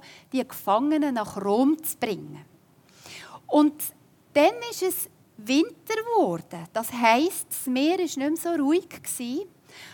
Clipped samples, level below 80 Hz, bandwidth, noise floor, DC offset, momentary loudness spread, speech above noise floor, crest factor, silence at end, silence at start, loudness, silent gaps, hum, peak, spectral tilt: under 0.1%; -74 dBFS; 18 kHz; -57 dBFS; under 0.1%; 14 LU; 32 dB; 20 dB; 0 s; 0.05 s; -25 LUFS; none; none; -6 dBFS; -3.5 dB/octave